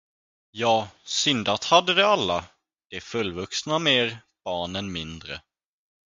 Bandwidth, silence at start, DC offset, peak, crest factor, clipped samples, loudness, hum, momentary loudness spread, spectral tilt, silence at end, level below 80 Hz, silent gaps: 9.6 kHz; 0.55 s; under 0.1%; -2 dBFS; 24 dB; under 0.1%; -23 LUFS; none; 18 LU; -3 dB/octave; 0.75 s; -56 dBFS; 2.85-2.90 s